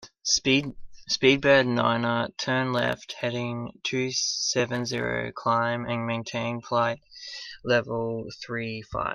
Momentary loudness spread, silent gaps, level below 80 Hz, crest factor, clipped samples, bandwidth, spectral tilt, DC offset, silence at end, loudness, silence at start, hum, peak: 12 LU; none; -56 dBFS; 22 dB; under 0.1%; 11 kHz; -3.5 dB/octave; under 0.1%; 0 s; -26 LUFS; 0 s; none; -6 dBFS